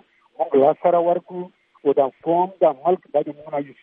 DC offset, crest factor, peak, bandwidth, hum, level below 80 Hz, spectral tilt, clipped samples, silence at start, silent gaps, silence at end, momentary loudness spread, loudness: under 0.1%; 16 dB; -4 dBFS; 3.8 kHz; none; -74 dBFS; -10.5 dB/octave; under 0.1%; 0.4 s; none; 0.1 s; 12 LU; -20 LUFS